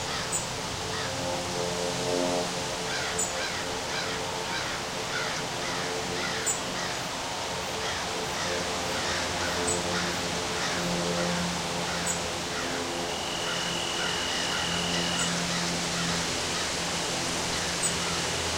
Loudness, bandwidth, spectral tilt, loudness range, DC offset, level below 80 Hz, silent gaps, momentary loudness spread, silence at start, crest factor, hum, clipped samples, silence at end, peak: -28 LUFS; 16 kHz; -2.5 dB/octave; 2 LU; under 0.1%; -52 dBFS; none; 4 LU; 0 s; 16 dB; none; under 0.1%; 0 s; -14 dBFS